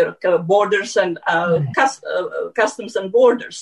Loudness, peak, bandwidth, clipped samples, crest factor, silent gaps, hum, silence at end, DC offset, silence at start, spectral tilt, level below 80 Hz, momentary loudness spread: -18 LUFS; -4 dBFS; 11 kHz; under 0.1%; 14 dB; none; none; 0 s; under 0.1%; 0 s; -5 dB/octave; -64 dBFS; 9 LU